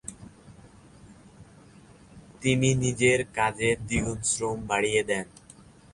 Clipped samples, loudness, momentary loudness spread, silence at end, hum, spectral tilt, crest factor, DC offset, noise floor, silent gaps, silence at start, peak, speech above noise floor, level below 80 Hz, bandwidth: under 0.1%; -26 LUFS; 8 LU; 0.65 s; none; -4 dB/octave; 20 dB; under 0.1%; -52 dBFS; none; 0.05 s; -8 dBFS; 27 dB; -50 dBFS; 11.5 kHz